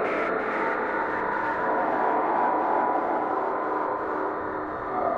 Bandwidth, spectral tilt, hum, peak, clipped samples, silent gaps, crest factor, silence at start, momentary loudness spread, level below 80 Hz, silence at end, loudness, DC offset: 8.2 kHz; -7 dB/octave; none; -12 dBFS; under 0.1%; none; 14 dB; 0 s; 5 LU; -58 dBFS; 0 s; -26 LUFS; under 0.1%